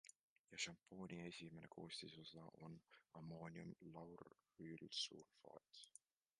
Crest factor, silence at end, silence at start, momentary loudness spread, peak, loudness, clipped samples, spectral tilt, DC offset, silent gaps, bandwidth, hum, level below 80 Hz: 24 dB; 0.5 s; 0.05 s; 15 LU; -34 dBFS; -55 LUFS; under 0.1%; -3.5 dB/octave; under 0.1%; 0.19-0.48 s; 11 kHz; none; -84 dBFS